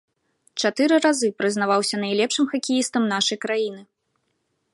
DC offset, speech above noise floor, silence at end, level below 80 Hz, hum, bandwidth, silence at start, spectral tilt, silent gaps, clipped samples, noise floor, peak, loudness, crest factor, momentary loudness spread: under 0.1%; 51 dB; 0.9 s; -74 dBFS; none; 11.5 kHz; 0.55 s; -3 dB/octave; none; under 0.1%; -73 dBFS; -6 dBFS; -21 LUFS; 18 dB; 7 LU